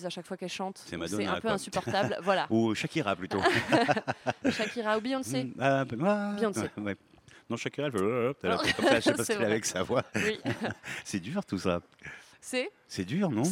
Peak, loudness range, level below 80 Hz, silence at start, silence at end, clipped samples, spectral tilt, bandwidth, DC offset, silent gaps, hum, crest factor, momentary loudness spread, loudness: -10 dBFS; 4 LU; -66 dBFS; 0 s; 0 s; under 0.1%; -4.5 dB/octave; 16.5 kHz; under 0.1%; none; none; 20 dB; 12 LU; -30 LUFS